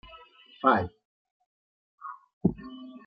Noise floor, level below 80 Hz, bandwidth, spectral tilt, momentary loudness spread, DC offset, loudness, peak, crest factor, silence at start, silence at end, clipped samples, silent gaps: -53 dBFS; -58 dBFS; 5.8 kHz; -5.5 dB/octave; 20 LU; under 0.1%; -28 LUFS; -8 dBFS; 24 dB; 0.15 s; 0.1 s; under 0.1%; 1.05-1.25 s, 1.31-1.40 s, 1.46-1.98 s, 2.33-2.41 s